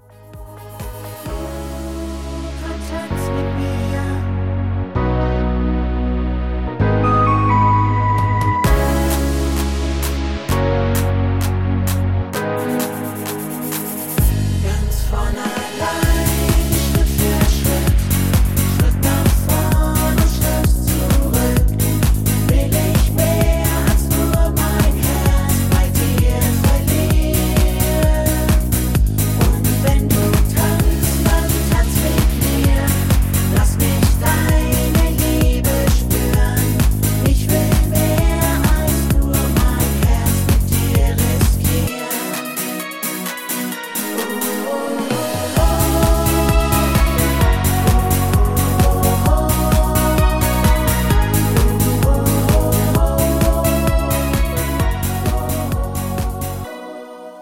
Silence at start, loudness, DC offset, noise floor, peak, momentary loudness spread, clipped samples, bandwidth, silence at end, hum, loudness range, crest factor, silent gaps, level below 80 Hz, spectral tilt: 0.2 s; -17 LUFS; 0.4%; -37 dBFS; 0 dBFS; 7 LU; under 0.1%; 17 kHz; 0 s; none; 5 LU; 14 dB; none; -20 dBFS; -5.5 dB/octave